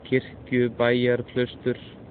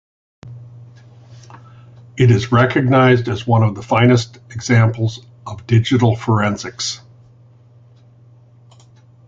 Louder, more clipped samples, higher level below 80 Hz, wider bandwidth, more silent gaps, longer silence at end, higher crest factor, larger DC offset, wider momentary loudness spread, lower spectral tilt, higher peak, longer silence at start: second, -25 LUFS vs -15 LUFS; neither; second, -54 dBFS vs -46 dBFS; second, 4.6 kHz vs 7.8 kHz; neither; second, 0 s vs 2.3 s; about the same, 18 dB vs 18 dB; neither; second, 8 LU vs 20 LU; second, -5 dB/octave vs -6.5 dB/octave; second, -8 dBFS vs 0 dBFS; second, 0 s vs 0.45 s